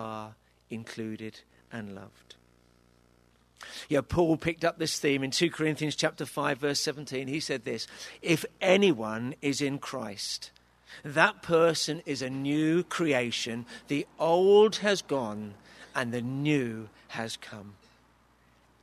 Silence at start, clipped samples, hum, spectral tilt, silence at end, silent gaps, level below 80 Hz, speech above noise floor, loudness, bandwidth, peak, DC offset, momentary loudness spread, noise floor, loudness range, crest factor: 0 s; under 0.1%; none; -4.5 dB/octave; 1.1 s; none; -60 dBFS; 35 dB; -28 LUFS; 13.5 kHz; -6 dBFS; under 0.1%; 18 LU; -64 dBFS; 8 LU; 24 dB